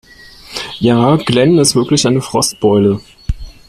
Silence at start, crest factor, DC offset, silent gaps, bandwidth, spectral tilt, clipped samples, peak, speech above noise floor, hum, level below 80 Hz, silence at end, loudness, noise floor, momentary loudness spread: 0.5 s; 14 dB; under 0.1%; none; 14.5 kHz; -5 dB/octave; under 0.1%; 0 dBFS; 26 dB; none; -32 dBFS; 0.2 s; -12 LUFS; -38 dBFS; 15 LU